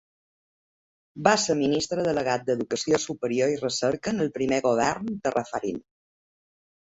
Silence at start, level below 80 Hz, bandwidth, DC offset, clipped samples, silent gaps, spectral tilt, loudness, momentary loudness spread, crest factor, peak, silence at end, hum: 1.15 s; -60 dBFS; 8.2 kHz; under 0.1%; under 0.1%; none; -4 dB/octave; -25 LUFS; 6 LU; 24 dB; -4 dBFS; 1.05 s; none